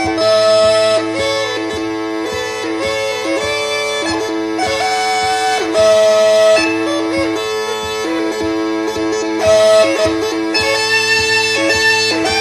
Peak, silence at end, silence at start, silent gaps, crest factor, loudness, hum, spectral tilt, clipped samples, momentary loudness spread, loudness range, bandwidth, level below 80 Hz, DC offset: 0 dBFS; 0 s; 0 s; none; 14 dB; -14 LUFS; none; -2.5 dB/octave; under 0.1%; 9 LU; 5 LU; 14.5 kHz; -44 dBFS; under 0.1%